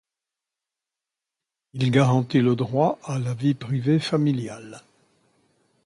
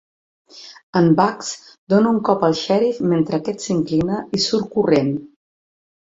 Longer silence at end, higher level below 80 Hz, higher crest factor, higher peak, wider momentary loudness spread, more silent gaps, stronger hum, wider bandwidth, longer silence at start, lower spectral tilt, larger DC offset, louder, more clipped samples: first, 1.05 s vs 0.85 s; second, -62 dBFS vs -56 dBFS; about the same, 20 dB vs 18 dB; about the same, -4 dBFS vs -2 dBFS; about the same, 15 LU vs 13 LU; second, none vs 0.83-0.93 s, 1.78-1.87 s; neither; first, 11 kHz vs 8 kHz; first, 1.75 s vs 0.55 s; first, -7.5 dB/octave vs -6 dB/octave; neither; second, -23 LUFS vs -19 LUFS; neither